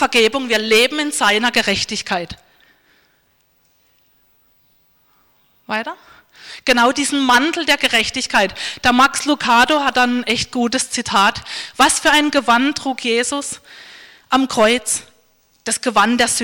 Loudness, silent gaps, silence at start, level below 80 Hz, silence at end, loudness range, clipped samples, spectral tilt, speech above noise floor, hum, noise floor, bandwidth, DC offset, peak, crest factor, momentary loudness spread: -15 LUFS; none; 0 s; -48 dBFS; 0 s; 14 LU; under 0.1%; -1.5 dB/octave; 44 dB; none; -60 dBFS; 19 kHz; under 0.1%; -4 dBFS; 14 dB; 11 LU